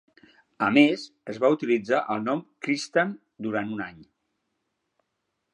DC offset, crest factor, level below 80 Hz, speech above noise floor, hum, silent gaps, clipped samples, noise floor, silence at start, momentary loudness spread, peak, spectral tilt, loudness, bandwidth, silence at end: under 0.1%; 24 dB; -72 dBFS; 54 dB; none; none; under 0.1%; -79 dBFS; 0.6 s; 14 LU; -4 dBFS; -5.5 dB/octave; -25 LUFS; 10.5 kHz; 1.5 s